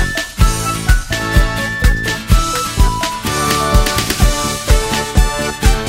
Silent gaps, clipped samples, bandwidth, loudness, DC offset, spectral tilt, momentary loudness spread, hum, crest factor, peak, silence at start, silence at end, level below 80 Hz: none; under 0.1%; 16.5 kHz; -15 LUFS; under 0.1%; -4 dB/octave; 4 LU; none; 14 dB; 0 dBFS; 0 s; 0 s; -16 dBFS